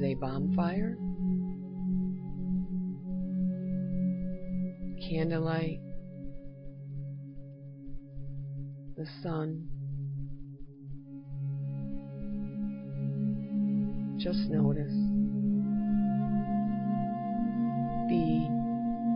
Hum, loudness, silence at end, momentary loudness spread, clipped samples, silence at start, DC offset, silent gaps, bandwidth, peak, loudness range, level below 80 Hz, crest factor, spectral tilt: none; -33 LUFS; 0 s; 16 LU; under 0.1%; 0 s; under 0.1%; none; 5.4 kHz; -16 dBFS; 10 LU; -50 dBFS; 16 dB; -12 dB/octave